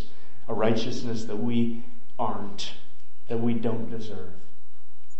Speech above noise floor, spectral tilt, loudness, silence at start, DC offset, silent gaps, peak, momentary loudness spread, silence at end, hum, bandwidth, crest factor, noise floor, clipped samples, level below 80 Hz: 33 dB; -6.5 dB/octave; -30 LUFS; 0 s; 10%; none; -8 dBFS; 16 LU; 0.8 s; none; 8.4 kHz; 20 dB; -62 dBFS; under 0.1%; -62 dBFS